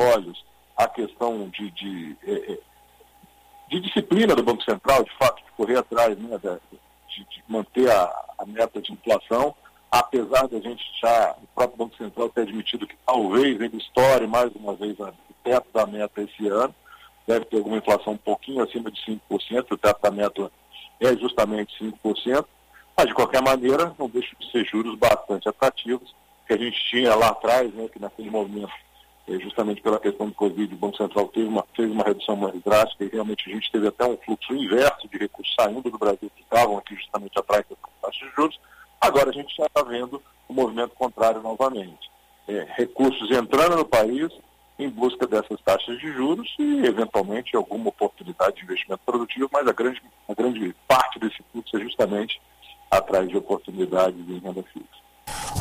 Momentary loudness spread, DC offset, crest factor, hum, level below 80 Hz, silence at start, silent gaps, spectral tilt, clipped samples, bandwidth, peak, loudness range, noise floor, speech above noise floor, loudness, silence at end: 13 LU; under 0.1%; 18 dB; none; -56 dBFS; 0 s; none; -4.5 dB/octave; under 0.1%; 15.5 kHz; -4 dBFS; 3 LU; -55 dBFS; 31 dB; -23 LUFS; 0 s